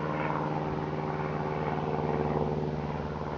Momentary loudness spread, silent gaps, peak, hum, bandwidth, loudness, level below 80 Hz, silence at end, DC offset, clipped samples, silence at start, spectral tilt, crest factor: 3 LU; none; -14 dBFS; none; 6.8 kHz; -32 LUFS; -50 dBFS; 0 s; under 0.1%; under 0.1%; 0 s; -8.5 dB/octave; 16 dB